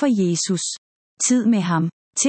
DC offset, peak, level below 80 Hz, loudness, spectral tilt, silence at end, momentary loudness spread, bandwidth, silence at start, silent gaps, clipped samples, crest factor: under 0.1%; -6 dBFS; -70 dBFS; -20 LUFS; -4.5 dB/octave; 0 s; 8 LU; 8.8 kHz; 0 s; 0.78-1.17 s, 1.92-2.13 s; under 0.1%; 14 dB